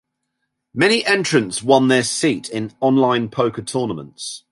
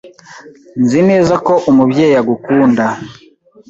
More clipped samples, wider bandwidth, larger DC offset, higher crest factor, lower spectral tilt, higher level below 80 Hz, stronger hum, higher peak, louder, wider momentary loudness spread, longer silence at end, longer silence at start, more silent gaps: neither; first, 11.5 kHz vs 7.8 kHz; neither; first, 18 dB vs 12 dB; second, -4 dB/octave vs -7 dB/octave; second, -60 dBFS vs -50 dBFS; neither; about the same, -2 dBFS vs -2 dBFS; second, -18 LUFS vs -11 LUFS; about the same, 13 LU vs 11 LU; second, 0.15 s vs 0.55 s; first, 0.75 s vs 0.05 s; neither